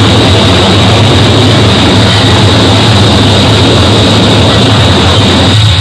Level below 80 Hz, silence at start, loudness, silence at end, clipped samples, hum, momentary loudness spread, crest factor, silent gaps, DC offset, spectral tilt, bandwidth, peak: -24 dBFS; 0 s; -4 LUFS; 0 s; 20%; none; 0 LU; 4 dB; none; under 0.1%; -5 dB/octave; 12 kHz; 0 dBFS